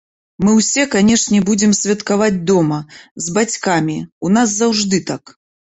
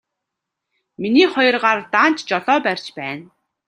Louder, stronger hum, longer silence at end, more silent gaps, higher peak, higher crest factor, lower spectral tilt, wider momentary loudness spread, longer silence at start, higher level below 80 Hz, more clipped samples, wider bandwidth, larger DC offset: about the same, -15 LUFS vs -17 LUFS; neither; first, 0.6 s vs 0.45 s; first, 3.11-3.16 s, 4.12-4.21 s vs none; about the same, -2 dBFS vs -2 dBFS; about the same, 14 dB vs 18 dB; about the same, -4 dB/octave vs -4.5 dB/octave; second, 10 LU vs 13 LU; second, 0.4 s vs 1 s; first, -50 dBFS vs -70 dBFS; neither; second, 8.2 kHz vs 10.5 kHz; neither